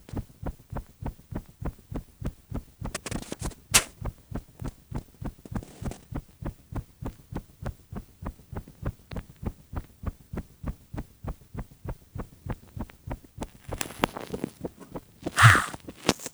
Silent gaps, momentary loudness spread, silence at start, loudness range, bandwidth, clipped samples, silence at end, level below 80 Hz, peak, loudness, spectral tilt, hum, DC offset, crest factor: none; 19 LU; 0.1 s; 14 LU; over 20 kHz; under 0.1%; 0.05 s; -42 dBFS; 0 dBFS; -30 LUFS; -3.5 dB/octave; none; under 0.1%; 32 dB